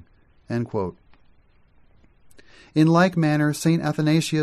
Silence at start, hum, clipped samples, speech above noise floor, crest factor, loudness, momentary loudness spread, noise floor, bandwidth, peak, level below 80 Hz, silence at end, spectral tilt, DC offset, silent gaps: 0.5 s; none; under 0.1%; 36 dB; 18 dB; -21 LUFS; 12 LU; -57 dBFS; 13 kHz; -6 dBFS; -58 dBFS; 0 s; -6.5 dB/octave; under 0.1%; none